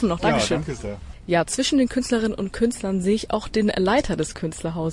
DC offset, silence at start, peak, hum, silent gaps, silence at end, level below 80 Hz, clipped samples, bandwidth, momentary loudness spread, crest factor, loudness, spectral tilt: under 0.1%; 0 s; -8 dBFS; none; none; 0 s; -40 dBFS; under 0.1%; 11.5 kHz; 8 LU; 14 dB; -23 LUFS; -5 dB/octave